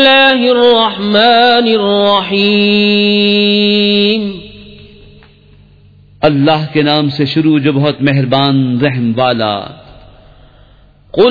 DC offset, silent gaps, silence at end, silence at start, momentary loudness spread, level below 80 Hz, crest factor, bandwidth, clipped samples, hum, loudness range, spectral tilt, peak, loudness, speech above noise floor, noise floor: under 0.1%; none; 0 s; 0 s; 7 LU; -46 dBFS; 12 dB; 5.2 kHz; under 0.1%; none; 6 LU; -7.5 dB/octave; 0 dBFS; -10 LUFS; 33 dB; -43 dBFS